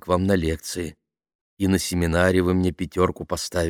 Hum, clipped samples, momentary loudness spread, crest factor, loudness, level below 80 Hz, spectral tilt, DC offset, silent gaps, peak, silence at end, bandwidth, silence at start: none; under 0.1%; 10 LU; 18 dB; -23 LUFS; -40 dBFS; -5.5 dB/octave; under 0.1%; 1.35-1.57 s; -4 dBFS; 0 s; 17.5 kHz; 0.05 s